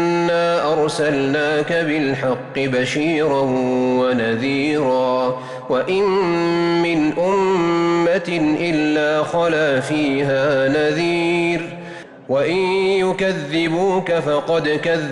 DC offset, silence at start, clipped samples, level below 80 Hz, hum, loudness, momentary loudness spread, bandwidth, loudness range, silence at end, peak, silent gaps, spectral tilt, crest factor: under 0.1%; 0 s; under 0.1%; -54 dBFS; none; -18 LUFS; 4 LU; 11.5 kHz; 1 LU; 0 s; -10 dBFS; none; -6 dB/octave; 8 dB